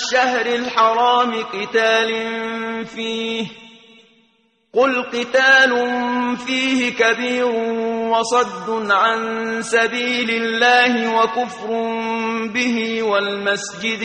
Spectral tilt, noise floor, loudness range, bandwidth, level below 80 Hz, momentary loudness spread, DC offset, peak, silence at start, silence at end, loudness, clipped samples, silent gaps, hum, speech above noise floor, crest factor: -2.5 dB/octave; -61 dBFS; 5 LU; 9.4 kHz; -62 dBFS; 10 LU; under 0.1%; -2 dBFS; 0 s; 0 s; -18 LUFS; under 0.1%; none; none; 43 dB; 16 dB